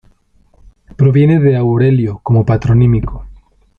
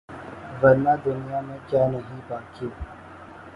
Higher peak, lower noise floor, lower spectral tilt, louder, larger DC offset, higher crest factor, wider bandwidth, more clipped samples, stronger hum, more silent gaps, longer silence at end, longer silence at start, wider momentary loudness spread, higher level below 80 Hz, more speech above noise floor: about the same, -2 dBFS vs -4 dBFS; first, -51 dBFS vs -43 dBFS; first, -10.5 dB/octave vs -9 dB/octave; first, -12 LUFS vs -23 LUFS; neither; second, 10 dB vs 20 dB; second, 4.4 kHz vs 5.6 kHz; neither; neither; neither; first, 0.45 s vs 0 s; first, 1 s vs 0.1 s; second, 7 LU vs 21 LU; first, -32 dBFS vs -48 dBFS; first, 41 dB vs 20 dB